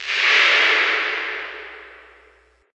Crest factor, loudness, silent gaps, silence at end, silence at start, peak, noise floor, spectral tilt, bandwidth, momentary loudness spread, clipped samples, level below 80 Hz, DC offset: 18 dB; -16 LUFS; none; 0.8 s; 0 s; -4 dBFS; -55 dBFS; 1 dB/octave; 9 kHz; 21 LU; under 0.1%; -62 dBFS; under 0.1%